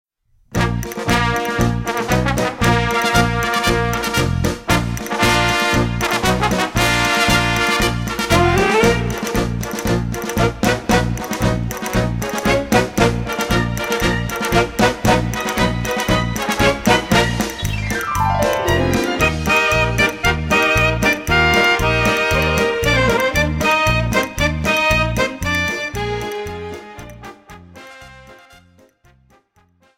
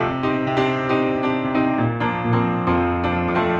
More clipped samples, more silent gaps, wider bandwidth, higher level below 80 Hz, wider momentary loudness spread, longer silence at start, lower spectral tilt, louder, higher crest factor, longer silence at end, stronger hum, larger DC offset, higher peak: neither; neither; first, 16.5 kHz vs 7.2 kHz; first, -30 dBFS vs -44 dBFS; first, 7 LU vs 2 LU; first, 0.5 s vs 0 s; second, -4.5 dB/octave vs -8 dB/octave; first, -17 LUFS vs -20 LUFS; about the same, 16 dB vs 14 dB; first, 1.6 s vs 0 s; neither; neither; first, -2 dBFS vs -6 dBFS